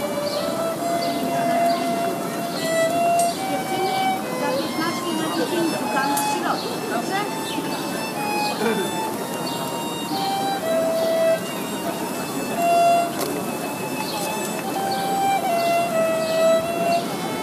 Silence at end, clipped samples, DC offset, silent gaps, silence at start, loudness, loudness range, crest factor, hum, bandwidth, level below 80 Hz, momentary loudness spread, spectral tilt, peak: 0 s; under 0.1%; under 0.1%; none; 0 s; -22 LUFS; 3 LU; 16 dB; none; 15.5 kHz; -64 dBFS; 7 LU; -4 dB/octave; -8 dBFS